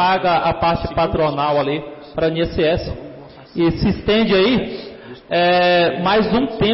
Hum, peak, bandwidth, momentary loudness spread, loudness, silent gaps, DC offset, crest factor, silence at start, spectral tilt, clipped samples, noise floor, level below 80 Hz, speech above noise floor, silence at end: none; -8 dBFS; 5.8 kHz; 15 LU; -17 LUFS; none; under 0.1%; 10 dB; 0 s; -10 dB/octave; under 0.1%; -37 dBFS; -36 dBFS; 21 dB; 0 s